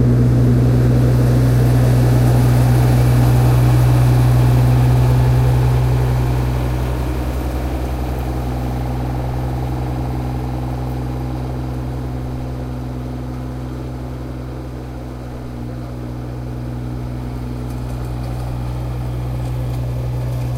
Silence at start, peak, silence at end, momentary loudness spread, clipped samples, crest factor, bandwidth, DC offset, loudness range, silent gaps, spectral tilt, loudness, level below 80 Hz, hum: 0 s; -2 dBFS; 0 s; 14 LU; under 0.1%; 14 dB; 15.5 kHz; 0.2%; 14 LU; none; -8 dB/octave; -18 LUFS; -24 dBFS; none